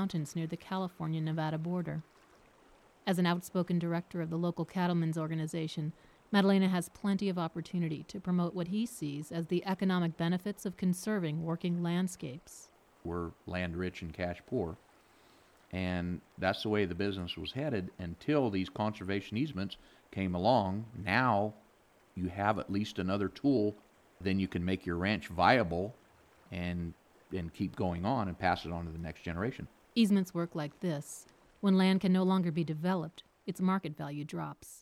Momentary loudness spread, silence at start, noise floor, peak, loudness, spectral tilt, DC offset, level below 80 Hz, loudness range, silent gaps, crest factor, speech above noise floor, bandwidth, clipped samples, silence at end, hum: 12 LU; 0 s; -65 dBFS; -12 dBFS; -34 LUFS; -6.5 dB/octave; under 0.1%; -60 dBFS; 5 LU; none; 22 dB; 32 dB; 14.5 kHz; under 0.1%; 0 s; none